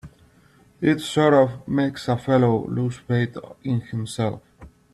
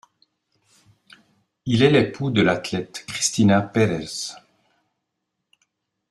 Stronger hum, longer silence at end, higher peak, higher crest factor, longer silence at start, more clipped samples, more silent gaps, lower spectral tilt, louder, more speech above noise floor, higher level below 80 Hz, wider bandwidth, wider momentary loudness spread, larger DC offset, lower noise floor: neither; second, 0.25 s vs 1.75 s; about the same, -4 dBFS vs -2 dBFS; about the same, 18 dB vs 20 dB; second, 0.05 s vs 1.65 s; neither; neither; first, -7 dB/octave vs -5 dB/octave; about the same, -22 LUFS vs -21 LUFS; second, 34 dB vs 59 dB; about the same, -54 dBFS vs -58 dBFS; about the same, 12.5 kHz vs 12.5 kHz; second, 10 LU vs 13 LU; neither; second, -55 dBFS vs -79 dBFS